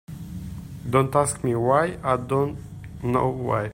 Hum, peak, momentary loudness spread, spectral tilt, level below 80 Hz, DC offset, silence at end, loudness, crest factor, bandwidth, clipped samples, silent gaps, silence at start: none; -6 dBFS; 16 LU; -6.5 dB/octave; -46 dBFS; under 0.1%; 0 s; -23 LUFS; 18 dB; 16 kHz; under 0.1%; none; 0.1 s